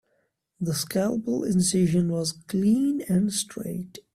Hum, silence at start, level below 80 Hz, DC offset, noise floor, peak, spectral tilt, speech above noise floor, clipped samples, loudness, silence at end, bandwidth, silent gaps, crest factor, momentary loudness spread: none; 0.6 s; -58 dBFS; under 0.1%; -72 dBFS; -12 dBFS; -5.5 dB/octave; 47 dB; under 0.1%; -25 LUFS; 0.15 s; 15 kHz; none; 14 dB; 10 LU